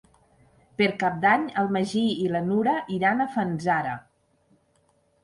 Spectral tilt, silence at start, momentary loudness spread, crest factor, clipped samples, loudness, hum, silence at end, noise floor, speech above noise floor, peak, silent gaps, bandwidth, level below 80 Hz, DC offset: -6 dB/octave; 0.8 s; 5 LU; 18 dB; under 0.1%; -24 LUFS; none; 1.25 s; -66 dBFS; 42 dB; -8 dBFS; none; 11.5 kHz; -64 dBFS; under 0.1%